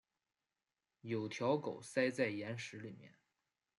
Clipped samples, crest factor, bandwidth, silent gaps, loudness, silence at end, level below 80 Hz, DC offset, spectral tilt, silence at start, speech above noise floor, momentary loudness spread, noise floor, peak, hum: under 0.1%; 20 dB; 11.5 kHz; none; -40 LUFS; 0.7 s; -86 dBFS; under 0.1%; -5.5 dB/octave; 1.05 s; over 50 dB; 16 LU; under -90 dBFS; -22 dBFS; none